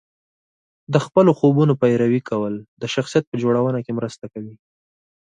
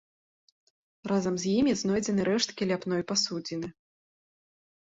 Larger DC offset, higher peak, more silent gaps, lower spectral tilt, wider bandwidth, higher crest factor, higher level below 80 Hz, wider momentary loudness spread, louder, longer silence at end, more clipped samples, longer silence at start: neither; first, -2 dBFS vs -12 dBFS; first, 2.68-2.77 s, 3.27-3.32 s vs none; first, -7.5 dB/octave vs -4.5 dB/octave; first, 9.4 kHz vs 8 kHz; about the same, 18 dB vs 18 dB; about the same, -62 dBFS vs -64 dBFS; first, 15 LU vs 11 LU; first, -19 LUFS vs -28 LUFS; second, 0.65 s vs 1.15 s; neither; second, 0.9 s vs 1.05 s